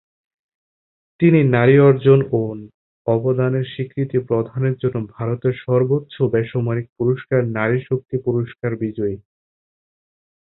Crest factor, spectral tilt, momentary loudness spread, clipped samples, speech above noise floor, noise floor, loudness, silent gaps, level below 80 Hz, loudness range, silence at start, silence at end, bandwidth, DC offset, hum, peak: 18 dB; -13 dB/octave; 12 LU; under 0.1%; over 72 dB; under -90 dBFS; -19 LUFS; 2.74-3.05 s, 6.92-6.96 s; -54 dBFS; 6 LU; 1.2 s; 1.3 s; 4.1 kHz; under 0.1%; none; -2 dBFS